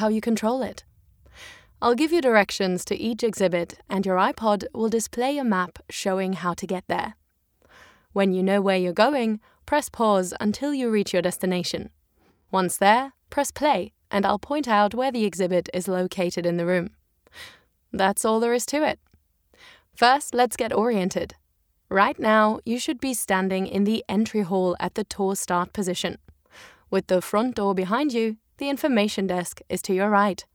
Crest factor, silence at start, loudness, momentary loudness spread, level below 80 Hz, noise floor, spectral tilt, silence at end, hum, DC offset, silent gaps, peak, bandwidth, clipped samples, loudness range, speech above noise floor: 22 dB; 0 s; -24 LUFS; 9 LU; -58 dBFS; -66 dBFS; -4.5 dB/octave; 0.1 s; none; under 0.1%; none; -4 dBFS; 19.5 kHz; under 0.1%; 3 LU; 43 dB